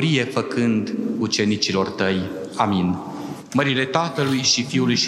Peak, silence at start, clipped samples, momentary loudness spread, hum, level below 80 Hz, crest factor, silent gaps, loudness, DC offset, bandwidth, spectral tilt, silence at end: -2 dBFS; 0 s; under 0.1%; 7 LU; none; -62 dBFS; 18 dB; none; -21 LUFS; under 0.1%; 13.5 kHz; -4.5 dB/octave; 0 s